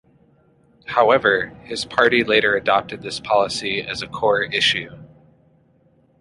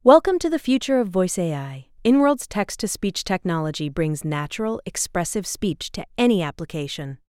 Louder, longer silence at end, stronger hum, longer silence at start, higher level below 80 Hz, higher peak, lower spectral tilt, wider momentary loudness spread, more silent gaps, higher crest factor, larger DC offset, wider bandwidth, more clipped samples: first, -19 LUFS vs -23 LUFS; first, 1.15 s vs 0.15 s; neither; first, 0.9 s vs 0.05 s; second, -54 dBFS vs -48 dBFS; about the same, -2 dBFS vs 0 dBFS; second, -3.5 dB/octave vs -5 dB/octave; about the same, 13 LU vs 11 LU; neither; about the same, 20 dB vs 20 dB; neither; second, 11.5 kHz vs 16.5 kHz; neither